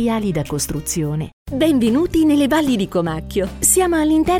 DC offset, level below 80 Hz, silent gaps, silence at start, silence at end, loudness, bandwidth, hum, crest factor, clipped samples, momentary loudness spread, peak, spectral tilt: under 0.1%; -36 dBFS; 1.33-1.45 s; 0 s; 0 s; -17 LUFS; 18.5 kHz; none; 14 dB; under 0.1%; 8 LU; -2 dBFS; -4.5 dB/octave